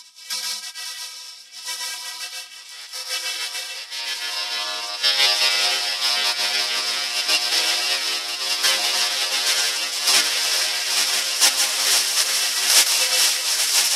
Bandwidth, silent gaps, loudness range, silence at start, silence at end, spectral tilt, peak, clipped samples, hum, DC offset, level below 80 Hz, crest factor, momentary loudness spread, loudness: 16 kHz; none; 12 LU; 0 s; 0 s; 4.5 dB/octave; -2 dBFS; under 0.1%; none; under 0.1%; -86 dBFS; 20 dB; 14 LU; -19 LUFS